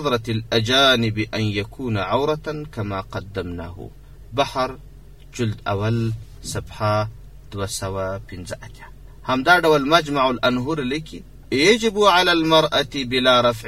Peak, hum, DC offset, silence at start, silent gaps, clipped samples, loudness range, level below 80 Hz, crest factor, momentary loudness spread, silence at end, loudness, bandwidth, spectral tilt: 0 dBFS; none; 0.4%; 0 s; none; under 0.1%; 9 LU; -44 dBFS; 20 dB; 18 LU; 0 s; -20 LUFS; 15.5 kHz; -4.5 dB/octave